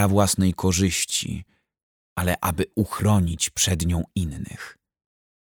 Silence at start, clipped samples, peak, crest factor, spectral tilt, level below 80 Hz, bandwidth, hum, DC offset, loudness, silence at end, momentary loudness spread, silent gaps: 0 s; under 0.1%; -6 dBFS; 18 dB; -4.5 dB/octave; -40 dBFS; 19.5 kHz; none; under 0.1%; -23 LUFS; 0.85 s; 14 LU; 1.83-2.16 s